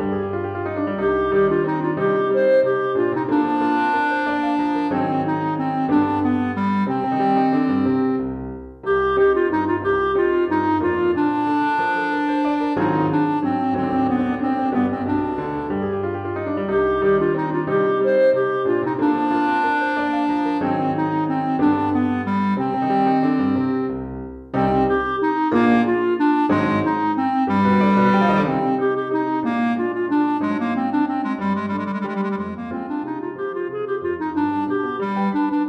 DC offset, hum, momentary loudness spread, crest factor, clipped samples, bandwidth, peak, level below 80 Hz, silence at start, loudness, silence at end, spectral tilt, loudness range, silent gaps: under 0.1%; none; 8 LU; 14 dB; under 0.1%; 6.2 kHz; -6 dBFS; -48 dBFS; 0 s; -20 LUFS; 0 s; -8.5 dB/octave; 4 LU; none